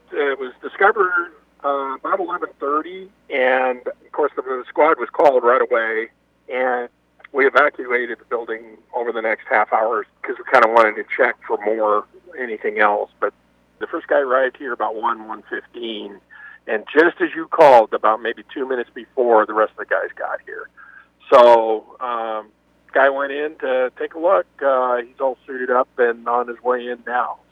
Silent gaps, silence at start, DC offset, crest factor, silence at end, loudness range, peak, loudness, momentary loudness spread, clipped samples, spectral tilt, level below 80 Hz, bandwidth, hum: none; 0.1 s; under 0.1%; 20 dB; 0.15 s; 4 LU; 0 dBFS; -19 LUFS; 14 LU; under 0.1%; -5 dB/octave; -68 dBFS; 8.6 kHz; 60 Hz at -65 dBFS